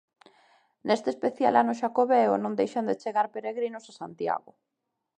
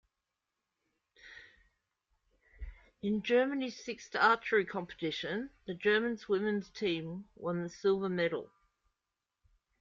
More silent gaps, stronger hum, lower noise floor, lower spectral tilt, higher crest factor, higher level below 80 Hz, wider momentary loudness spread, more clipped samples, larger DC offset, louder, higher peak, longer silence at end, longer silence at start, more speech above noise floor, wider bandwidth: neither; neither; second, -83 dBFS vs -89 dBFS; about the same, -6 dB/octave vs -5.5 dB/octave; about the same, 20 dB vs 22 dB; second, -78 dBFS vs -62 dBFS; second, 11 LU vs 22 LU; neither; neither; first, -27 LUFS vs -33 LUFS; first, -8 dBFS vs -14 dBFS; second, 0.8 s vs 1.35 s; second, 0.85 s vs 1.25 s; about the same, 57 dB vs 56 dB; first, 9.6 kHz vs 7.4 kHz